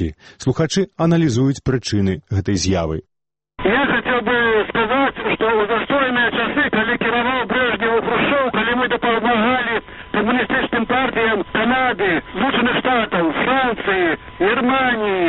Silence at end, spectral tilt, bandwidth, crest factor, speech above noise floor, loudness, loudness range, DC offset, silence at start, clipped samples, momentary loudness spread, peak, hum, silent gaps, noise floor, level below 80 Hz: 0 s; -5.5 dB/octave; 8.4 kHz; 14 dB; 22 dB; -18 LUFS; 2 LU; under 0.1%; 0 s; under 0.1%; 5 LU; -4 dBFS; none; none; -40 dBFS; -42 dBFS